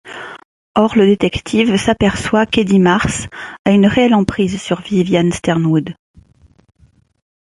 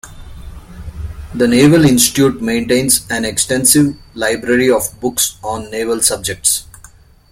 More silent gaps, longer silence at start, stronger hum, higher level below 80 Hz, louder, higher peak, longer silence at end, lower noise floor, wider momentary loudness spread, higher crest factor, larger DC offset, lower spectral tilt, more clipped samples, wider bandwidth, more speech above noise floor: first, 0.45-0.74 s, 3.59-3.65 s vs none; about the same, 0.05 s vs 0.05 s; neither; about the same, -38 dBFS vs -36 dBFS; about the same, -14 LUFS vs -13 LUFS; about the same, -2 dBFS vs 0 dBFS; first, 1.55 s vs 0.7 s; first, -50 dBFS vs -43 dBFS; second, 10 LU vs 15 LU; about the same, 14 dB vs 14 dB; neither; first, -6 dB/octave vs -3.5 dB/octave; neither; second, 11.5 kHz vs 17 kHz; first, 36 dB vs 29 dB